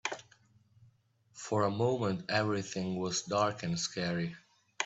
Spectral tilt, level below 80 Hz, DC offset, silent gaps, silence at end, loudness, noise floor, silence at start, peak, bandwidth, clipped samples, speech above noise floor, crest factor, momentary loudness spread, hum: -4.5 dB/octave; -70 dBFS; under 0.1%; none; 0 s; -33 LUFS; -68 dBFS; 0.05 s; -16 dBFS; 8.4 kHz; under 0.1%; 35 dB; 20 dB; 10 LU; none